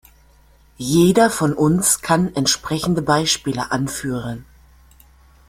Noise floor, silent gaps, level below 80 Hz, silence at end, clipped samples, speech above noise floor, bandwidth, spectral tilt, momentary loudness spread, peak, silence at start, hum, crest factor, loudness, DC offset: -51 dBFS; none; -46 dBFS; 1.05 s; under 0.1%; 34 dB; 16 kHz; -4 dB/octave; 11 LU; -2 dBFS; 0.8 s; none; 18 dB; -18 LUFS; under 0.1%